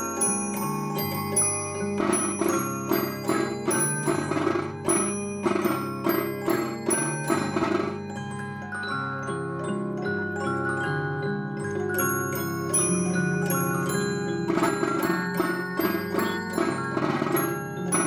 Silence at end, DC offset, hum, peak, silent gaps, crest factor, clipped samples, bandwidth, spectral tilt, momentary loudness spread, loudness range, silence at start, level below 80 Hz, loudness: 0 s; under 0.1%; none; -10 dBFS; none; 18 dB; under 0.1%; 17 kHz; -4.5 dB/octave; 6 LU; 4 LU; 0 s; -62 dBFS; -26 LUFS